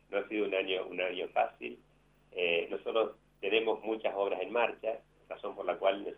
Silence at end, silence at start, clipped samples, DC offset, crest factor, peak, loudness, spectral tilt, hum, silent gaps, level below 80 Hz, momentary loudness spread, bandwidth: 0.05 s; 0.1 s; under 0.1%; under 0.1%; 20 dB; -14 dBFS; -33 LUFS; -6 dB/octave; none; none; -72 dBFS; 12 LU; 4 kHz